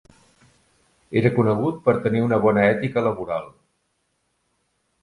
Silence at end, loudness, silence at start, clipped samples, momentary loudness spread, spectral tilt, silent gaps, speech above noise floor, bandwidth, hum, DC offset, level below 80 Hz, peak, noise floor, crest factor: 1.55 s; -21 LUFS; 1.1 s; under 0.1%; 9 LU; -9 dB/octave; none; 51 dB; 11 kHz; none; under 0.1%; -56 dBFS; -2 dBFS; -71 dBFS; 20 dB